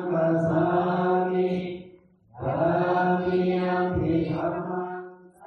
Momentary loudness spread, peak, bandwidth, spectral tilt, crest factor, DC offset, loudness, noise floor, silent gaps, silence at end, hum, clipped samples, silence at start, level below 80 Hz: 11 LU; -12 dBFS; 6 kHz; -9.5 dB/octave; 14 dB; under 0.1%; -25 LUFS; -53 dBFS; none; 0 s; none; under 0.1%; 0 s; -54 dBFS